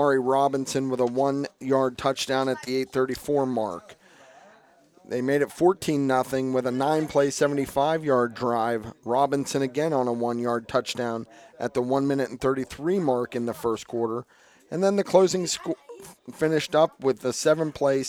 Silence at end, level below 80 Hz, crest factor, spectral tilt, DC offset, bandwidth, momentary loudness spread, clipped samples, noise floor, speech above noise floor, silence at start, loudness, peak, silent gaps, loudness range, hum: 0 s; -60 dBFS; 22 dB; -5 dB/octave; under 0.1%; 17.5 kHz; 8 LU; under 0.1%; -57 dBFS; 32 dB; 0 s; -25 LUFS; -4 dBFS; none; 3 LU; none